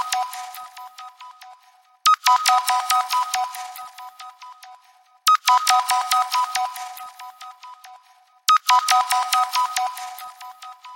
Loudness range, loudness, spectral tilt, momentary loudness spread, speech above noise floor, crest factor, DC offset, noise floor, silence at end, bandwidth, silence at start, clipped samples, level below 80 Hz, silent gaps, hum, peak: 1 LU; -19 LUFS; 5 dB/octave; 24 LU; 35 dB; 20 dB; under 0.1%; -55 dBFS; 0 s; 17.5 kHz; 0 s; under 0.1%; -82 dBFS; none; none; -2 dBFS